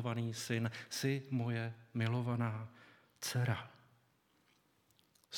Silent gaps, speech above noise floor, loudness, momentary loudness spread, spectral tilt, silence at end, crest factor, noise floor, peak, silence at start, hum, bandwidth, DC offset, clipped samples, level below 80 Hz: none; 36 dB; -39 LUFS; 7 LU; -5.5 dB/octave; 0 s; 18 dB; -74 dBFS; -22 dBFS; 0 s; none; 17.5 kHz; under 0.1%; under 0.1%; -78 dBFS